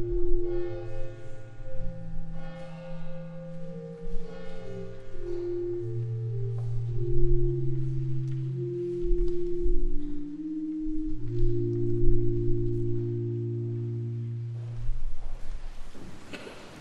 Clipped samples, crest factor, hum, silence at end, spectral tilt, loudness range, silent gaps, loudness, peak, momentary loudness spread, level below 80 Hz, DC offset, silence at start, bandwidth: under 0.1%; 18 dB; none; 0 s; -9.5 dB/octave; 11 LU; none; -33 LUFS; -8 dBFS; 14 LU; -32 dBFS; under 0.1%; 0 s; 3.5 kHz